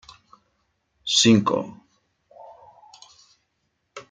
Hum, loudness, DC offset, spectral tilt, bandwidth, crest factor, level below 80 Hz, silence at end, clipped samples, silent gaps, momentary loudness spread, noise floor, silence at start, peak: none; -19 LUFS; under 0.1%; -3.5 dB/octave; 9.4 kHz; 22 dB; -66 dBFS; 0.1 s; under 0.1%; none; 27 LU; -74 dBFS; 1.05 s; -4 dBFS